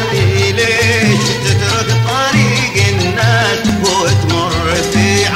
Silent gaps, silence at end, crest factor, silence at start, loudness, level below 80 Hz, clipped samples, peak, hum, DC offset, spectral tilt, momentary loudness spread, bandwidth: none; 0 s; 12 dB; 0 s; -12 LUFS; -34 dBFS; under 0.1%; 0 dBFS; none; 0.2%; -4.5 dB/octave; 3 LU; 16 kHz